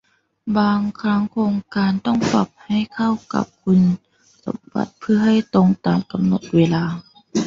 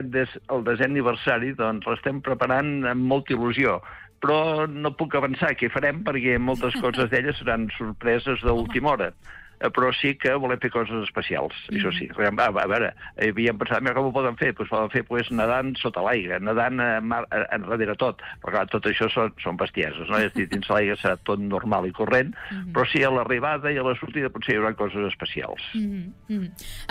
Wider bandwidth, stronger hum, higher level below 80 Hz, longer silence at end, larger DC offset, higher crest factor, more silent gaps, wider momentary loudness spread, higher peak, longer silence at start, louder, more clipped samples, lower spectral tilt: second, 7.6 kHz vs 15.5 kHz; neither; second, -54 dBFS vs -46 dBFS; about the same, 0 s vs 0 s; neither; about the same, 16 dB vs 14 dB; neither; first, 10 LU vs 6 LU; first, -4 dBFS vs -10 dBFS; first, 0.45 s vs 0 s; first, -19 LUFS vs -24 LUFS; neither; about the same, -7 dB/octave vs -6.5 dB/octave